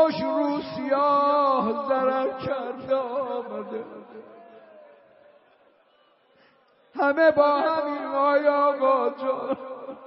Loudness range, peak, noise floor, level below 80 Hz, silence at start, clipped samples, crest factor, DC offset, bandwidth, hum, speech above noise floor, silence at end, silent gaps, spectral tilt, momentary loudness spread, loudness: 14 LU; -8 dBFS; -62 dBFS; -68 dBFS; 0 s; under 0.1%; 18 dB; under 0.1%; 5.8 kHz; none; 38 dB; 0 s; none; -3 dB/octave; 15 LU; -24 LUFS